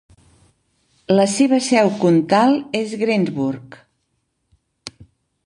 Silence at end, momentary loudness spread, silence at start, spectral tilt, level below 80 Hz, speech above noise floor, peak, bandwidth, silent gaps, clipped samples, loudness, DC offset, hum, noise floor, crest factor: 0.55 s; 22 LU; 1.1 s; -5.5 dB/octave; -60 dBFS; 54 dB; -2 dBFS; 11 kHz; none; under 0.1%; -17 LUFS; under 0.1%; none; -70 dBFS; 18 dB